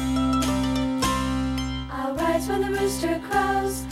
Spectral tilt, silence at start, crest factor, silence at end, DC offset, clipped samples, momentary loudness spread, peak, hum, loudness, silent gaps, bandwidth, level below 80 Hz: -5 dB/octave; 0 s; 14 dB; 0 s; under 0.1%; under 0.1%; 5 LU; -10 dBFS; none; -25 LUFS; none; 16 kHz; -36 dBFS